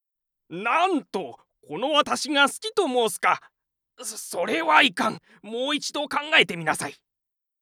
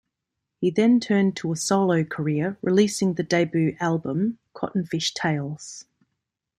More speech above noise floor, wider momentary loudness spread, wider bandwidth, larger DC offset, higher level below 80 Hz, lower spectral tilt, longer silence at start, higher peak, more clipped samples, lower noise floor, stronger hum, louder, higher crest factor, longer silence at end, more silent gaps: about the same, 60 dB vs 60 dB; first, 16 LU vs 9 LU; first, 17 kHz vs 14.5 kHz; neither; second, -74 dBFS vs -64 dBFS; second, -2 dB/octave vs -5.5 dB/octave; about the same, 0.5 s vs 0.6 s; first, -2 dBFS vs -6 dBFS; neither; about the same, -84 dBFS vs -83 dBFS; neither; about the same, -23 LUFS vs -23 LUFS; about the same, 22 dB vs 18 dB; about the same, 0.7 s vs 0.75 s; neither